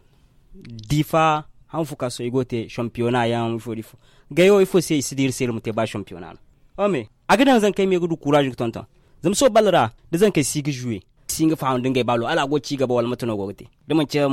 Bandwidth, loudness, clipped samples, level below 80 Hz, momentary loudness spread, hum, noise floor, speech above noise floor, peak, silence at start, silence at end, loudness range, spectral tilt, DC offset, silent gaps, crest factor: 16.5 kHz; -21 LUFS; under 0.1%; -50 dBFS; 14 LU; none; -55 dBFS; 34 dB; -6 dBFS; 0.5 s; 0 s; 4 LU; -5 dB/octave; under 0.1%; none; 16 dB